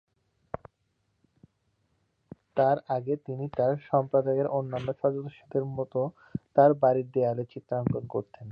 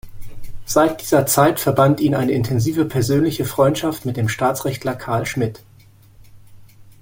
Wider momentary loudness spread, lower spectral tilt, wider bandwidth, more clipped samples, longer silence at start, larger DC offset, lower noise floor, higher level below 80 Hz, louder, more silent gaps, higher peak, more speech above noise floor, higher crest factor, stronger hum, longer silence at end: first, 13 LU vs 8 LU; first, -10.5 dB/octave vs -5.5 dB/octave; second, 5.2 kHz vs 17 kHz; neither; first, 2.55 s vs 0.05 s; neither; first, -75 dBFS vs -48 dBFS; second, -62 dBFS vs -44 dBFS; second, -28 LUFS vs -18 LUFS; neither; second, -8 dBFS vs -2 dBFS; first, 48 dB vs 30 dB; about the same, 20 dB vs 18 dB; neither; about the same, 0 s vs 0.1 s